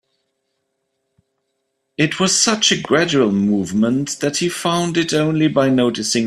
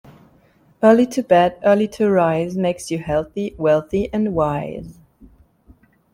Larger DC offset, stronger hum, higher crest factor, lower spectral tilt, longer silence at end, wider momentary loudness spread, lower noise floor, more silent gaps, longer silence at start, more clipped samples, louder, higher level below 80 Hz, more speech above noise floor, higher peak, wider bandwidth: neither; neither; about the same, 16 dB vs 18 dB; second, -3.5 dB/octave vs -6.5 dB/octave; second, 0 s vs 1.2 s; second, 6 LU vs 10 LU; first, -72 dBFS vs -55 dBFS; neither; first, 2 s vs 0.8 s; neither; about the same, -16 LUFS vs -18 LUFS; second, -58 dBFS vs -46 dBFS; first, 56 dB vs 37 dB; about the same, -2 dBFS vs -2 dBFS; second, 13.5 kHz vs 16 kHz